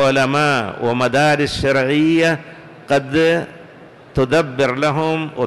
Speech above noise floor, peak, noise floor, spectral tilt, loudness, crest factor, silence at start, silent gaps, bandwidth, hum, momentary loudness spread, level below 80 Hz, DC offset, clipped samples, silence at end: 25 dB; -8 dBFS; -41 dBFS; -5.5 dB/octave; -17 LUFS; 8 dB; 0 s; none; 12.5 kHz; none; 6 LU; -42 dBFS; under 0.1%; under 0.1%; 0 s